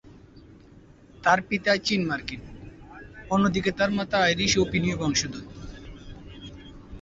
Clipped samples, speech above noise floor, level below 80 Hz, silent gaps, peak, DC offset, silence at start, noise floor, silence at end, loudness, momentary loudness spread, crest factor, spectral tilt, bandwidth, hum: under 0.1%; 27 dB; -48 dBFS; none; -6 dBFS; under 0.1%; 0.05 s; -51 dBFS; 0 s; -24 LUFS; 23 LU; 22 dB; -4 dB/octave; 8 kHz; none